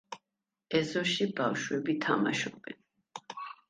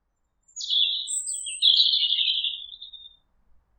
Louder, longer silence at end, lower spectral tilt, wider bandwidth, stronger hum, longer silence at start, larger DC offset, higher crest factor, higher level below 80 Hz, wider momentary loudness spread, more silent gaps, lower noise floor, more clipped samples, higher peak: second, -31 LUFS vs -21 LUFS; second, 0.15 s vs 0.7 s; first, -4.5 dB/octave vs 6.5 dB/octave; second, 9.8 kHz vs 16.5 kHz; neither; second, 0.1 s vs 0.55 s; neither; about the same, 20 dB vs 20 dB; about the same, -74 dBFS vs -70 dBFS; second, 19 LU vs 22 LU; neither; first, -88 dBFS vs -67 dBFS; neither; second, -14 dBFS vs -8 dBFS